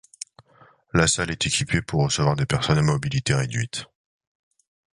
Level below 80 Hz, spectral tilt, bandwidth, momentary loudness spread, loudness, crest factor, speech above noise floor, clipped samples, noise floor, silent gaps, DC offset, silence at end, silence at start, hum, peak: -44 dBFS; -4 dB/octave; 11.5 kHz; 12 LU; -22 LUFS; 20 dB; 33 dB; under 0.1%; -56 dBFS; none; under 0.1%; 1.15 s; 0.95 s; none; -4 dBFS